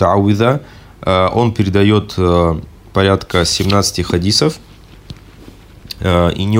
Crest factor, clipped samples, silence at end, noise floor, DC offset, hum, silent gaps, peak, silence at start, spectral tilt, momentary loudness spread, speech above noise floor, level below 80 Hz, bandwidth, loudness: 14 dB; under 0.1%; 0 s; -38 dBFS; under 0.1%; none; none; 0 dBFS; 0 s; -5.5 dB/octave; 9 LU; 25 dB; -36 dBFS; 16 kHz; -14 LUFS